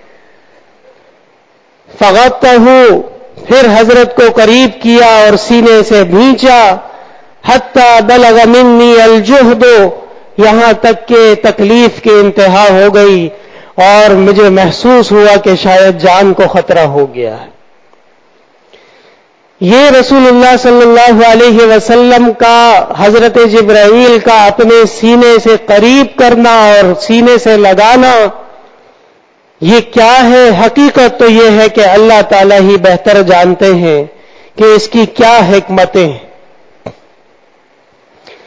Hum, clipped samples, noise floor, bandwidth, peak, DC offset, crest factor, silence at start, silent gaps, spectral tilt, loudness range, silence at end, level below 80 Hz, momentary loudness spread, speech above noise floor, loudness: none; 8%; -46 dBFS; 8 kHz; 0 dBFS; under 0.1%; 6 dB; 2 s; none; -5 dB/octave; 5 LU; 1.55 s; -38 dBFS; 5 LU; 42 dB; -4 LUFS